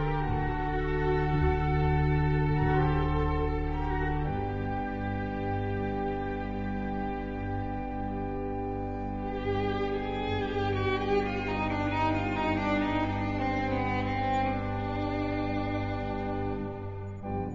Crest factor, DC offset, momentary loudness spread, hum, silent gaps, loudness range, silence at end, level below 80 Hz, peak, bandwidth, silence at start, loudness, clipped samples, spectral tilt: 16 dB; 0.2%; 7 LU; none; none; 5 LU; 0 s; -38 dBFS; -14 dBFS; 7.4 kHz; 0 s; -31 LUFS; under 0.1%; -6 dB/octave